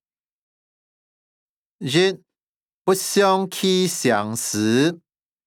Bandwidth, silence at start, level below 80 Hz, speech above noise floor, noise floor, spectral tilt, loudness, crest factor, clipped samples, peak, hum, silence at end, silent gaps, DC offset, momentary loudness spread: 18.5 kHz; 1.8 s; -74 dBFS; over 71 dB; under -90 dBFS; -4 dB/octave; -20 LUFS; 18 dB; under 0.1%; -6 dBFS; none; 0.5 s; 2.43-2.85 s; under 0.1%; 9 LU